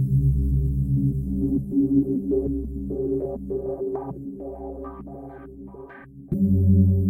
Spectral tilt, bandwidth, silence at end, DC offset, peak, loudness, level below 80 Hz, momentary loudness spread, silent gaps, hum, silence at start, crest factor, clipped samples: -13 dB/octave; 2.1 kHz; 0 s; under 0.1%; -8 dBFS; -24 LUFS; -34 dBFS; 20 LU; none; none; 0 s; 16 dB; under 0.1%